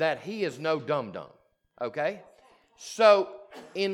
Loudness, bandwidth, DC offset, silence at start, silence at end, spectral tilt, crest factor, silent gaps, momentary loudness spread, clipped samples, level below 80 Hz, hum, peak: -27 LUFS; 12.5 kHz; under 0.1%; 0 s; 0 s; -4.5 dB/octave; 22 dB; none; 23 LU; under 0.1%; -78 dBFS; none; -8 dBFS